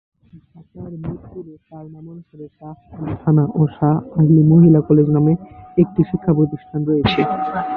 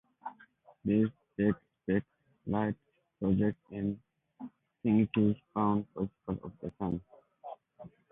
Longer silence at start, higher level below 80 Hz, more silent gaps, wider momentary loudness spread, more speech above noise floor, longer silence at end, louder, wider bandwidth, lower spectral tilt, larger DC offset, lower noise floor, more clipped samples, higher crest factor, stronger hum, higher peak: about the same, 0.35 s vs 0.25 s; first, -44 dBFS vs -58 dBFS; neither; first, 25 LU vs 20 LU; about the same, 28 dB vs 30 dB; second, 0 s vs 0.25 s; first, -16 LUFS vs -33 LUFS; first, 4.9 kHz vs 3.8 kHz; about the same, -11 dB/octave vs -11.5 dB/octave; neither; second, -45 dBFS vs -61 dBFS; neither; about the same, 14 dB vs 18 dB; neither; first, -2 dBFS vs -16 dBFS